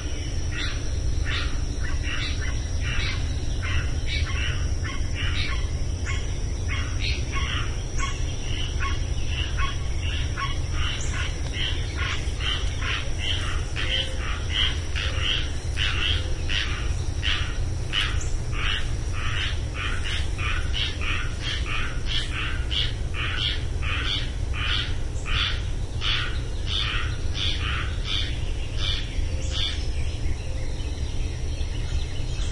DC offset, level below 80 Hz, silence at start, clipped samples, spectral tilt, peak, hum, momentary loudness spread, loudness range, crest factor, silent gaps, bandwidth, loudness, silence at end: under 0.1%; -28 dBFS; 0 s; under 0.1%; -3.5 dB/octave; -10 dBFS; none; 5 LU; 3 LU; 16 dB; none; 11.5 kHz; -27 LUFS; 0 s